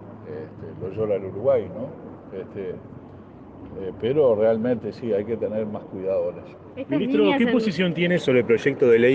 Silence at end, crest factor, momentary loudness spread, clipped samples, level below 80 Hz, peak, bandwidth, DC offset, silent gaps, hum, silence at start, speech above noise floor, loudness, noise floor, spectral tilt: 0 s; 16 dB; 21 LU; under 0.1%; -60 dBFS; -6 dBFS; 8 kHz; under 0.1%; none; none; 0 s; 21 dB; -23 LUFS; -43 dBFS; -7.5 dB/octave